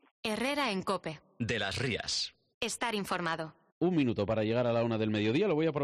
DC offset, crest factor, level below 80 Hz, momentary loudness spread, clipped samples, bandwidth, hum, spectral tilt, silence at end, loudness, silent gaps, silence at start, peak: under 0.1%; 12 dB; -62 dBFS; 8 LU; under 0.1%; 13 kHz; none; -5 dB/octave; 0 s; -32 LUFS; 2.54-2.61 s, 3.72-3.81 s; 0.25 s; -20 dBFS